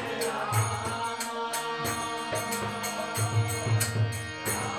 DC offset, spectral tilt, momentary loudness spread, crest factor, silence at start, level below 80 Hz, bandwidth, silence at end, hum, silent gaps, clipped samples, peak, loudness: under 0.1%; -4 dB/octave; 4 LU; 16 dB; 0 s; -60 dBFS; 17 kHz; 0 s; none; none; under 0.1%; -14 dBFS; -30 LUFS